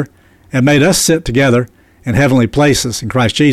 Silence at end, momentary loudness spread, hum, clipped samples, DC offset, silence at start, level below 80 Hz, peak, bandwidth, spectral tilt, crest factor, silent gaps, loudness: 0 s; 10 LU; none; under 0.1%; under 0.1%; 0 s; -34 dBFS; -2 dBFS; 15 kHz; -5 dB/octave; 10 dB; none; -12 LUFS